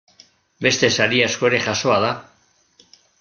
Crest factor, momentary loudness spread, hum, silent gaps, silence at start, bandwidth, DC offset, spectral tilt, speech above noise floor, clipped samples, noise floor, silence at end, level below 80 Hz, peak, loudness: 20 dB; 6 LU; none; none; 0.6 s; 10 kHz; under 0.1%; -3 dB/octave; 38 dB; under 0.1%; -56 dBFS; 1 s; -60 dBFS; -2 dBFS; -18 LUFS